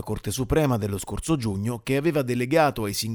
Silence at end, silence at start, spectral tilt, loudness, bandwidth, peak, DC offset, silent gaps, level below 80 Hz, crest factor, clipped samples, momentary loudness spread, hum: 0 s; 0 s; -5.5 dB/octave; -25 LUFS; over 20 kHz; -8 dBFS; under 0.1%; none; -42 dBFS; 16 dB; under 0.1%; 8 LU; none